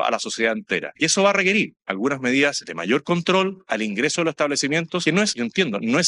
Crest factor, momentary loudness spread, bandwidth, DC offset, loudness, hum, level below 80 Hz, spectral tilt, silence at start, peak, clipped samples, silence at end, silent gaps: 16 dB; 7 LU; 11 kHz; under 0.1%; -21 LUFS; none; -66 dBFS; -3.5 dB/octave; 0 s; -4 dBFS; under 0.1%; 0 s; none